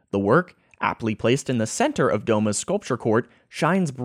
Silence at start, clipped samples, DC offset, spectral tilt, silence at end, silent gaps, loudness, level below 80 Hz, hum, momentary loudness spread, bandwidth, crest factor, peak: 0.15 s; under 0.1%; under 0.1%; -5.5 dB/octave; 0 s; none; -23 LUFS; -60 dBFS; none; 6 LU; 15.5 kHz; 18 dB; -6 dBFS